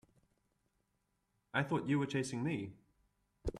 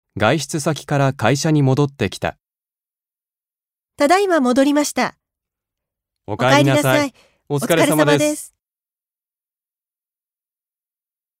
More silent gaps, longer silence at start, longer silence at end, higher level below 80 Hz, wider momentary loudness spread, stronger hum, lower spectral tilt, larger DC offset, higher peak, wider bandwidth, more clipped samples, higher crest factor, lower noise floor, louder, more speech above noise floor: neither; first, 1.55 s vs 0.15 s; second, 0 s vs 2.95 s; about the same, -58 dBFS vs -56 dBFS; about the same, 10 LU vs 11 LU; neither; about the same, -6 dB/octave vs -5 dB/octave; neither; second, -18 dBFS vs 0 dBFS; second, 12 kHz vs 16 kHz; neither; about the same, 22 dB vs 20 dB; second, -82 dBFS vs under -90 dBFS; second, -38 LUFS vs -17 LUFS; second, 46 dB vs over 74 dB